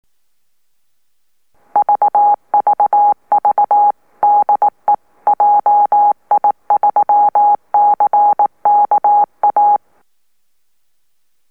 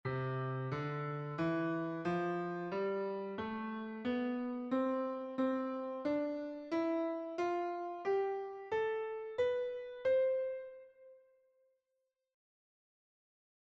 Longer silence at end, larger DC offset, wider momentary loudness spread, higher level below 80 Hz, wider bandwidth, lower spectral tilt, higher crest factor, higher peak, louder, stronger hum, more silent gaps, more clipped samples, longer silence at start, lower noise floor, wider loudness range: second, 1.75 s vs 2.55 s; first, 0.2% vs under 0.1%; about the same, 4 LU vs 6 LU; first, -70 dBFS vs -78 dBFS; second, 2.5 kHz vs 7.6 kHz; about the same, -7 dB/octave vs -8 dB/octave; about the same, 10 dB vs 14 dB; first, -4 dBFS vs -24 dBFS; first, -13 LUFS vs -38 LUFS; neither; neither; neither; first, 1.75 s vs 0.05 s; second, -70 dBFS vs -86 dBFS; about the same, 3 LU vs 3 LU